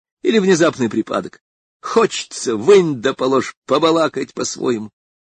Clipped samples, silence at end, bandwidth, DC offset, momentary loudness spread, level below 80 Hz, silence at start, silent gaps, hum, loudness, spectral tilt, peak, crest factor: under 0.1%; 0.4 s; 9.4 kHz; under 0.1%; 11 LU; -60 dBFS; 0.25 s; 1.41-1.80 s, 3.57-3.62 s; none; -17 LUFS; -4.5 dB/octave; -2 dBFS; 16 dB